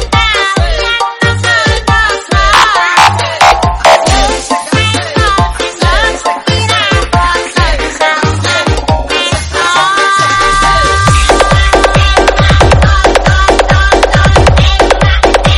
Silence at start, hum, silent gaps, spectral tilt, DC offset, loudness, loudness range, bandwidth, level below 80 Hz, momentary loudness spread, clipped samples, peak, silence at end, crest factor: 0 s; none; none; -4 dB/octave; under 0.1%; -8 LUFS; 3 LU; 13.5 kHz; -16 dBFS; 5 LU; 0.8%; 0 dBFS; 0 s; 8 dB